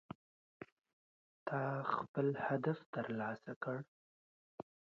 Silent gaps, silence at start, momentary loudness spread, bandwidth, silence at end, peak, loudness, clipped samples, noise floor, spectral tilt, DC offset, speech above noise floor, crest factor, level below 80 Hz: 0.72-0.77 s, 0.93-1.46 s, 2.08-2.14 s, 2.86-2.93 s, 3.56-3.61 s, 3.88-4.58 s; 0.6 s; 20 LU; 7 kHz; 0.3 s; -22 dBFS; -41 LUFS; under 0.1%; under -90 dBFS; -6.5 dB/octave; under 0.1%; over 50 dB; 22 dB; -82 dBFS